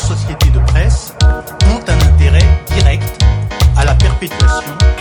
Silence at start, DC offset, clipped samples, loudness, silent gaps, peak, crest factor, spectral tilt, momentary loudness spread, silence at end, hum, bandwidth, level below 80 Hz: 0 s; under 0.1%; under 0.1%; -12 LUFS; none; 0 dBFS; 10 dB; -5 dB/octave; 4 LU; 0 s; none; 18 kHz; -12 dBFS